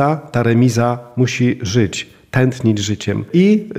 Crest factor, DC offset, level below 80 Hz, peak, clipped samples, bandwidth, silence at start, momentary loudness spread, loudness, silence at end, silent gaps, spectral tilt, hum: 14 dB; under 0.1%; -48 dBFS; -2 dBFS; under 0.1%; 13.5 kHz; 0 s; 7 LU; -16 LUFS; 0 s; none; -6 dB/octave; none